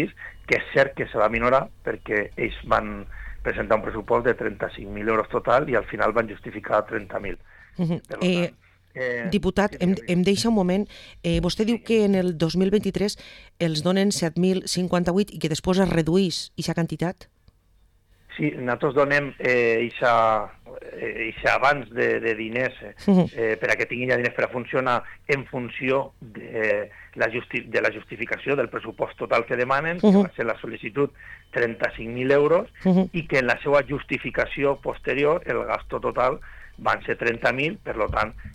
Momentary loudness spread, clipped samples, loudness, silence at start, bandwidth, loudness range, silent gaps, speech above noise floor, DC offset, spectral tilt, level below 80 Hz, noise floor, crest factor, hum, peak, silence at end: 11 LU; under 0.1%; -24 LUFS; 0 s; 13 kHz; 3 LU; none; 36 dB; under 0.1%; -6 dB/octave; -46 dBFS; -60 dBFS; 18 dB; none; -4 dBFS; 0 s